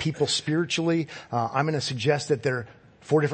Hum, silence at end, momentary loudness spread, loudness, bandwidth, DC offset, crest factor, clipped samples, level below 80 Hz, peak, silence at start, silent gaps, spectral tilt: none; 0 s; 5 LU; -26 LUFS; 8.8 kHz; under 0.1%; 18 dB; under 0.1%; -64 dBFS; -8 dBFS; 0 s; none; -5 dB/octave